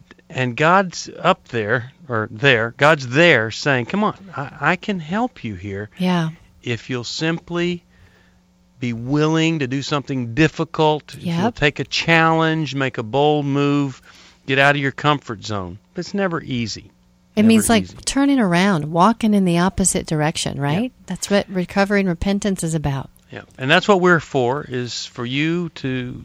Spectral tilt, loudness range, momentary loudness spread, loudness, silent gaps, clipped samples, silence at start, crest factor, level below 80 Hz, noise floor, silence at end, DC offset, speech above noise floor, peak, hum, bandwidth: -5 dB/octave; 6 LU; 13 LU; -19 LUFS; none; under 0.1%; 0.3 s; 20 dB; -46 dBFS; -55 dBFS; 0 s; under 0.1%; 36 dB; 0 dBFS; none; 16 kHz